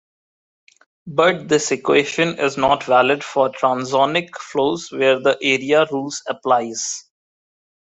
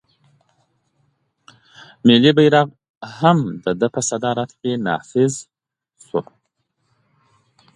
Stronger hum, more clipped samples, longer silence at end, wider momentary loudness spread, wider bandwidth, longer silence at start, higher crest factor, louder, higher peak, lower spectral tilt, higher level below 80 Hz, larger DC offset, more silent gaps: neither; neither; second, 0.95 s vs 1.55 s; second, 9 LU vs 14 LU; second, 8.4 kHz vs 11.5 kHz; second, 1.05 s vs 2.05 s; about the same, 18 dB vs 20 dB; about the same, -18 LUFS vs -18 LUFS; about the same, -2 dBFS vs 0 dBFS; second, -3.5 dB/octave vs -5 dB/octave; about the same, -60 dBFS vs -62 dBFS; neither; second, none vs 2.89-3.01 s